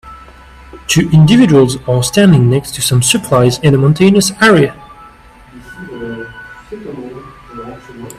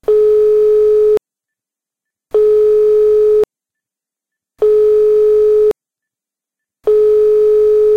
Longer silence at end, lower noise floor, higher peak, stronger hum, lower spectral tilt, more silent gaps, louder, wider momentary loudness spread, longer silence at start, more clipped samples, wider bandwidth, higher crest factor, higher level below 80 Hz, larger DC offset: about the same, 0.05 s vs 0 s; second, -39 dBFS vs -86 dBFS; first, 0 dBFS vs -6 dBFS; neither; about the same, -5.5 dB/octave vs -6.5 dB/octave; neither; about the same, -10 LUFS vs -11 LUFS; first, 22 LU vs 6 LU; about the same, 0.05 s vs 0.1 s; neither; first, 15 kHz vs 4.5 kHz; about the same, 12 dB vs 8 dB; first, -40 dBFS vs -46 dBFS; neither